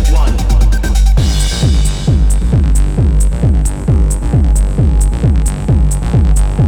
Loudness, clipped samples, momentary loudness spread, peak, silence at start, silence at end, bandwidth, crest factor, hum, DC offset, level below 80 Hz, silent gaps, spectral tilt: -13 LUFS; under 0.1%; 1 LU; 0 dBFS; 0 s; 0 s; 12.5 kHz; 10 dB; none; under 0.1%; -10 dBFS; none; -6 dB/octave